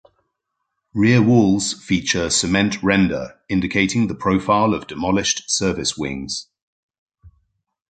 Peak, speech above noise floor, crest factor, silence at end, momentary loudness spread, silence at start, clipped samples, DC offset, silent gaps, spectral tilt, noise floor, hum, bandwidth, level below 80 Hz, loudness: -2 dBFS; 58 dB; 18 dB; 0.6 s; 10 LU; 0.95 s; under 0.1%; under 0.1%; 6.62-6.89 s, 6.98-7.07 s; -4.5 dB/octave; -77 dBFS; none; 9.4 kHz; -44 dBFS; -19 LUFS